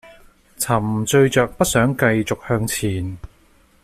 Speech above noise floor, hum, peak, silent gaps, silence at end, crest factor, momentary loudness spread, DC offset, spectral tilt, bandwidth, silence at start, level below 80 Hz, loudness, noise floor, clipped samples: 36 dB; none; -4 dBFS; none; 0.55 s; 16 dB; 11 LU; under 0.1%; -5 dB/octave; 16 kHz; 0.05 s; -44 dBFS; -19 LUFS; -54 dBFS; under 0.1%